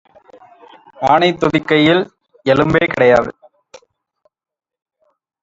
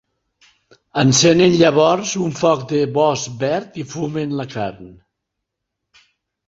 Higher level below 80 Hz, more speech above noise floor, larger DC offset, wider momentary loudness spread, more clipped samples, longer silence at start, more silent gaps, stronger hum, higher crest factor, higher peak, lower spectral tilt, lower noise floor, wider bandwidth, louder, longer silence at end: first, -48 dBFS vs -54 dBFS; second, 50 dB vs 62 dB; neither; second, 10 LU vs 14 LU; neither; about the same, 1 s vs 0.95 s; neither; neither; about the same, 16 dB vs 18 dB; about the same, 0 dBFS vs -2 dBFS; first, -6.5 dB/octave vs -4.5 dB/octave; second, -63 dBFS vs -79 dBFS; about the same, 7.8 kHz vs 8 kHz; first, -14 LUFS vs -17 LUFS; first, 2.1 s vs 1.55 s